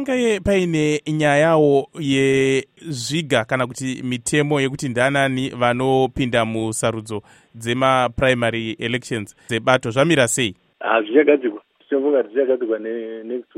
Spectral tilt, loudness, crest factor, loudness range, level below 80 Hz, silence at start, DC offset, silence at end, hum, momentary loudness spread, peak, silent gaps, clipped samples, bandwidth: -5 dB/octave; -19 LUFS; 18 dB; 2 LU; -48 dBFS; 0 s; under 0.1%; 0.15 s; none; 11 LU; 0 dBFS; none; under 0.1%; 15.5 kHz